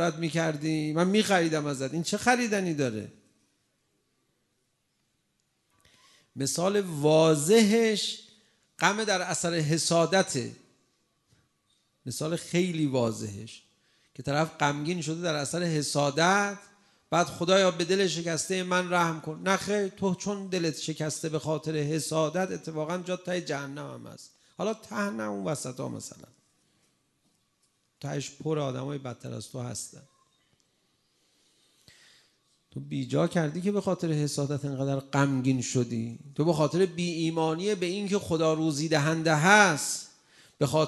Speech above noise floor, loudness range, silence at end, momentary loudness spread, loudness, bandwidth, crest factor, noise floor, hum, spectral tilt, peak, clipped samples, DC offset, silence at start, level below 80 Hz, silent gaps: 48 dB; 12 LU; 0 s; 14 LU; -28 LUFS; 12.5 kHz; 22 dB; -75 dBFS; none; -4.5 dB/octave; -6 dBFS; under 0.1%; under 0.1%; 0 s; -66 dBFS; none